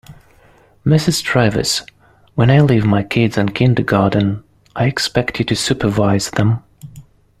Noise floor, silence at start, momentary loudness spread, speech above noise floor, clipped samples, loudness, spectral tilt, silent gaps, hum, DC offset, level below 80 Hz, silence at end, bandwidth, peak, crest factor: -49 dBFS; 0.1 s; 8 LU; 35 dB; under 0.1%; -16 LUFS; -5.5 dB/octave; none; none; under 0.1%; -42 dBFS; 0.4 s; 15 kHz; -2 dBFS; 14 dB